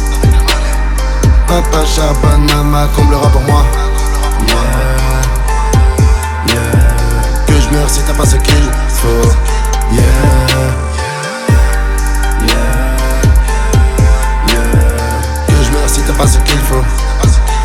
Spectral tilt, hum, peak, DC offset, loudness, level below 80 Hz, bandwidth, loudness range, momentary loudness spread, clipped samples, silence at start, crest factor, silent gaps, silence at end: -5 dB/octave; none; 0 dBFS; under 0.1%; -11 LUFS; -10 dBFS; 16 kHz; 1 LU; 5 LU; under 0.1%; 0 s; 8 dB; none; 0 s